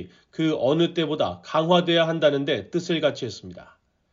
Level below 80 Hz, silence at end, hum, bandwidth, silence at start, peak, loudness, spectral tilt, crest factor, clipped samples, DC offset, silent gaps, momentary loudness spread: -66 dBFS; 0.5 s; none; 7.6 kHz; 0 s; -6 dBFS; -23 LUFS; -4 dB/octave; 18 dB; under 0.1%; under 0.1%; none; 14 LU